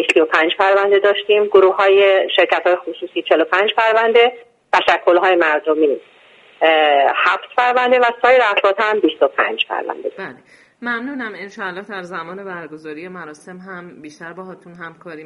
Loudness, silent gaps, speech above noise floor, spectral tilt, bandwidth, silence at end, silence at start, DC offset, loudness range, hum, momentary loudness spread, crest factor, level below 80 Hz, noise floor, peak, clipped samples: -15 LUFS; none; 23 dB; -4 dB/octave; 9 kHz; 0 s; 0 s; under 0.1%; 15 LU; none; 21 LU; 16 dB; -64 dBFS; -39 dBFS; 0 dBFS; under 0.1%